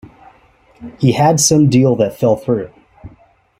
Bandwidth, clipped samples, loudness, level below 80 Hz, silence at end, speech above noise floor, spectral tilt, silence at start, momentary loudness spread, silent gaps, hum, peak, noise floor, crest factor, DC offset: 16 kHz; under 0.1%; -13 LUFS; -48 dBFS; 0.5 s; 37 dB; -5.5 dB/octave; 0.8 s; 9 LU; none; none; 0 dBFS; -50 dBFS; 16 dB; under 0.1%